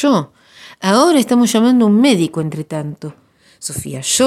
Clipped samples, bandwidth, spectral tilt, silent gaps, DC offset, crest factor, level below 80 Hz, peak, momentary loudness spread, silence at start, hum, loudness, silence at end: under 0.1%; 15.5 kHz; -4.5 dB/octave; none; under 0.1%; 14 dB; -56 dBFS; 0 dBFS; 16 LU; 0 s; none; -14 LUFS; 0 s